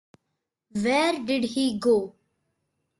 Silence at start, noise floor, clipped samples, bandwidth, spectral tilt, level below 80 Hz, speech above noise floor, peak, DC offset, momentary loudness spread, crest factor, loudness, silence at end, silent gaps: 0.75 s; -81 dBFS; under 0.1%; 12.5 kHz; -4.5 dB/octave; -66 dBFS; 57 dB; -12 dBFS; under 0.1%; 9 LU; 16 dB; -25 LUFS; 0.9 s; none